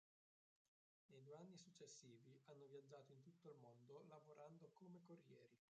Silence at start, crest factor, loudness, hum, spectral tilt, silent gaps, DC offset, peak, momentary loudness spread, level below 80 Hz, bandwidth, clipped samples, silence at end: 1.1 s; 16 dB; -66 LUFS; none; -5 dB/octave; none; under 0.1%; -50 dBFS; 5 LU; under -90 dBFS; 8.4 kHz; under 0.1%; 0.15 s